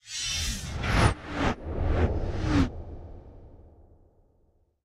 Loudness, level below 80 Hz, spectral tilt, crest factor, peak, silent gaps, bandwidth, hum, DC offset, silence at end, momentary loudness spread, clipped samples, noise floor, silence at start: -28 LUFS; -34 dBFS; -5 dB/octave; 22 dB; -8 dBFS; none; 15 kHz; none; under 0.1%; 1.15 s; 19 LU; under 0.1%; -66 dBFS; 0.05 s